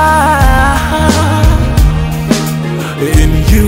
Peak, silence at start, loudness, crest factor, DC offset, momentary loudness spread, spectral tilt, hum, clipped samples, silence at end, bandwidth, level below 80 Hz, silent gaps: 0 dBFS; 0 s; -10 LUFS; 8 dB; under 0.1%; 7 LU; -5.5 dB/octave; none; 0.8%; 0 s; 16.5 kHz; -12 dBFS; none